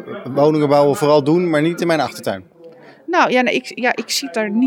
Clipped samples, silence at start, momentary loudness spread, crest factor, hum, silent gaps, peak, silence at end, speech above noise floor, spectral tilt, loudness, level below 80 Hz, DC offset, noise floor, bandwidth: under 0.1%; 0 s; 10 LU; 14 dB; none; none; -2 dBFS; 0 s; 26 dB; -5 dB/octave; -16 LUFS; -72 dBFS; under 0.1%; -42 dBFS; 19 kHz